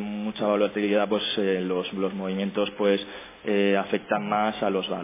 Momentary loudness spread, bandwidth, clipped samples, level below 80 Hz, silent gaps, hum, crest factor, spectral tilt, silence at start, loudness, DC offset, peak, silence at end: 5 LU; 3.8 kHz; under 0.1%; -62 dBFS; none; none; 18 dB; -9.5 dB/octave; 0 s; -26 LUFS; under 0.1%; -8 dBFS; 0 s